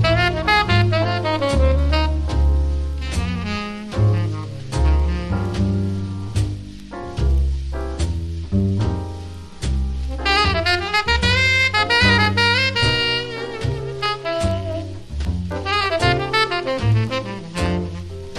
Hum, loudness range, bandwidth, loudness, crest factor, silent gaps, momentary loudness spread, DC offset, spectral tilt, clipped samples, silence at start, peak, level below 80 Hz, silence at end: none; 7 LU; 12 kHz; -19 LUFS; 16 dB; none; 12 LU; under 0.1%; -5.5 dB/octave; under 0.1%; 0 s; -2 dBFS; -26 dBFS; 0 s